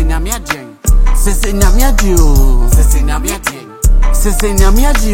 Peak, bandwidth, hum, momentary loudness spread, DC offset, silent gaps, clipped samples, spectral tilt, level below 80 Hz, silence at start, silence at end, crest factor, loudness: 0 dBFS; 17 kHz; none; 6 LU; under 0.1%; none; 0.3%; -4.5 dB/octave; -8 dBFS; 0 s; 0 s; 8 dB; -13 LUFS